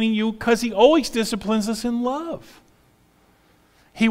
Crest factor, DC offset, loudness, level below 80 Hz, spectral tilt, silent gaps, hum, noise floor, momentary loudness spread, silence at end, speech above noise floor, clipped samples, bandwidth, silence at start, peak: 18 dB; under 0.1%; -21 LUFS; -50 dBFS; -4.5 dB/octave; none; none; -58 dBFS; 12 LU; 0 s; 37 dB; under 0.1%; 16 kHz; 0 s; -4 dBFS